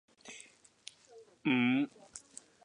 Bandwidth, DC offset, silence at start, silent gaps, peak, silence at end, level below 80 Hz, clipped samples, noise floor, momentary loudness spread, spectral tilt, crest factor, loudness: 11 kHz; under 0.1%; 0.25 s; none; -20 dBFS; 0.45 s; -82 dBFS; under 0.1%; -59 dBFS; 23 LU; -4.5 dB/octave; 18 dB; -32 LUFS